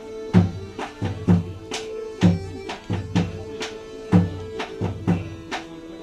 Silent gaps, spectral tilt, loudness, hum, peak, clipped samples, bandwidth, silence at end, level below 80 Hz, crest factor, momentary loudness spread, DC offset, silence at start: none; -7 dB/octave; -25 LUFS; none; -2 dBFS; under 0.1%; 9.8 kHz; 0 s; -46 dBFS; 22 dB; 12 LU; under 0.1%; 0 s